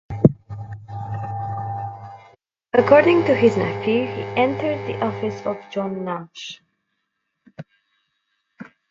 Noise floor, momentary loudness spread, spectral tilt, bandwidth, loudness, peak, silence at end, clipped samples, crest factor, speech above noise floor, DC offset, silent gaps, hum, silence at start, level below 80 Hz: -76 dBFS; 21 LU; -7.5 dB/octave; 7.6 kHz; -20 LUFS; 0 dBFS; 0.25 s; under 0.1%; 22 dB; 57 dB; under 0.1%; none; none; 0.1 s; -52 dBFS